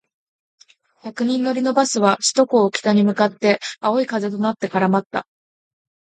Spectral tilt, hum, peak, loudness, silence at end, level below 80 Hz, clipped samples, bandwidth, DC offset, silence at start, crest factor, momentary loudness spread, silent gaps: -4.5 dB/octave; none; -2 dBFS; -19 LUFS; 0.8 s; -68 dBFS; under 0.1%; 9.4 kHz; under 0.1%; 1.05 s; 18 dB; 8 LU; 5.06-5.10 s